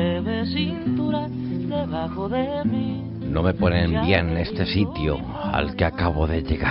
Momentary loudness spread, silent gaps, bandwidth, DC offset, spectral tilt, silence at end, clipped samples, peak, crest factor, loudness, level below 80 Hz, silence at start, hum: 7 LU; none; 5.8 kHz; under 0.1%; -5.5 dB/octave; 0 s; under 0.1%; -4 dBFS; 20 dB; -24 LUFS; -38 dBFS; 0 s; none